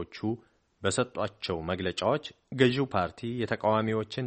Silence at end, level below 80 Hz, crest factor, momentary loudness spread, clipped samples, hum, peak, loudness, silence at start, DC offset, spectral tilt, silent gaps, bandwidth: 0 s; -60 dBFS; 22 dB; 9 LU; under 0.1%; none; -8 dBFS; -30 LUFS; 0 s; under 0.1%; -5.5 dB/octave; none; 8.4 kHz